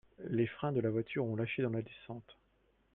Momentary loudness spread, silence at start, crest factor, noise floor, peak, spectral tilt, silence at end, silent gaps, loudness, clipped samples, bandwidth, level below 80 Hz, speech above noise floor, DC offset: 14 LU; 0.2 s; 16 dB; -73 dBFS; -20 dBFS; -10.5 dB/octave; 0.6 s; none; -36 LUFS; under 0.1%; 4 kHz; -70 dBFS; 37 dB; under 0.1%